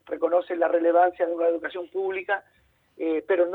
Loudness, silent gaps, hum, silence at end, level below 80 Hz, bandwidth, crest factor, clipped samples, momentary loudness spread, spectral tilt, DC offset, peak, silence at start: -25 LUFS; none; none; 0 s; -72 dBFS; 4 kHz; 16 dB; under 0.1%; 9 LU; -6.5 dB/octave; under 0.1%; -10 dBFS; 0.1 s